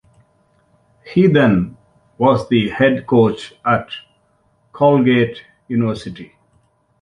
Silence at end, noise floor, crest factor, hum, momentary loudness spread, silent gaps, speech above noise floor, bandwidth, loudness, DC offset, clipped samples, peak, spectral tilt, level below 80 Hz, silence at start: 0.8 s; -60 dBFS; 16 dB; none; 17 LU; none; 45 dB; 10.5 kHz; -16 LUFS; under 0.1%; under 0.1%; -2 dBFS; -8 dB/octave; -48 dBFS; 1.05 s